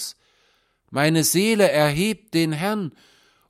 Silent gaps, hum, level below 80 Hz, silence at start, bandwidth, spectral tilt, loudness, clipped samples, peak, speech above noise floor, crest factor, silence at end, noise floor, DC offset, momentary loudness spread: none; none; -56 dBFS; 0 s; 16 kHz; -4.5 dB/octave; -20 LUFS; under 0.1%; -4 dBFS; 44 dB; 18 dB; 0.6 s; -64 dBFS; under 0.1%; 12 LU